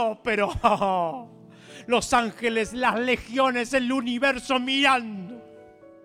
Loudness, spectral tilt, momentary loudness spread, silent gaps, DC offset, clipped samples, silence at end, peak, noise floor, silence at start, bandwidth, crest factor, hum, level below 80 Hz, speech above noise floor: -23 LUFS; -3.5 dB/octave; 15 LU; none; under 0.1%; under 0.1%; 0.2 s; -4 dBFS; -49 dBFS; 0 s; 15.5 kHz; 20 dB; none; -50 dBFS; 25 dB